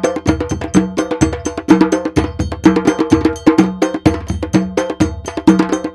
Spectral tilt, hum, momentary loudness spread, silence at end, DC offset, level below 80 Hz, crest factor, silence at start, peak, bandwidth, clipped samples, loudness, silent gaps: -6.5 dB/octave; none; 6 LU; 0 s; under 0.1%; -30 dBFS; 14 dB; 0 s; 0 dBFS; 12 kHz; 0.4%; -15 LUFS; none